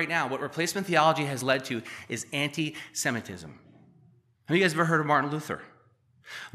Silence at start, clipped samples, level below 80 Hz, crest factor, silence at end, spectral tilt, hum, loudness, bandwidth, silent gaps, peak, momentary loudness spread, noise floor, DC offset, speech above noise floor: 0 s; under 0.1%; -72 dBFS; 22 dB; 0.05 s; -4 dB/octave; none; -27 LUFS; 15 kHz; none; -6 dBFS; 15 LU; -63 dBFS; under 0.1%; 35 dB